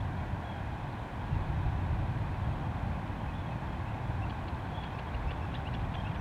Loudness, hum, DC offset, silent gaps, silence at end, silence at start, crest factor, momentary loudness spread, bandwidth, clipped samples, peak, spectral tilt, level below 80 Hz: -36 LUFS; none; under 0.1%; none; 0 s; 0 s; 16 dB; 5 LU; 10 kHz; under 0.1%; -20 dBFS; -8 dB/octave; -40 dBFS